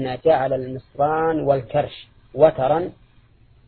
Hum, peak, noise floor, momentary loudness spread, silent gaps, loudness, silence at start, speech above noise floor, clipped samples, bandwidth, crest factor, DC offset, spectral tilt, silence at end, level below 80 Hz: none; -2 dBFS; -53 dBFS; 15 LU; none; -20 LUFS; 0 s; 33 dB; under 0.1%; 4.5 kHz; 20 dB; under 0.1%; -11 dB/octave; 0.75 s; -50 dBFS